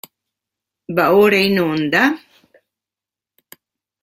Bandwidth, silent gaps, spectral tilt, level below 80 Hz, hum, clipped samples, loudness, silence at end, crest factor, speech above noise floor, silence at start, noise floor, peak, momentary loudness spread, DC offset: 16.5 kHz; none; -5.5 dB/octave; -60 dBFS; none; under 0.1%; -15 LUFS; 1.85 s; 18 dB; 74 dB; 0.9 s; -88 dBFS; -2 dBFS; 9 LU; under 0.1%